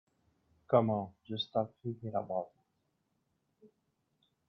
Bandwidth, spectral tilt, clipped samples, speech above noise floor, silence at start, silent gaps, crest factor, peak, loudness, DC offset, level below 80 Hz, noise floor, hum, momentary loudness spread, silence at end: 6 kHz; -9 dB/octave; under 0.1%; 46 dB; 0.7 s; none; 24 dB; -14 dBFS; -35 LUFS; under 0.1%; -74 dBFS; -80 dBFS; none; 13 LU; 0.8 s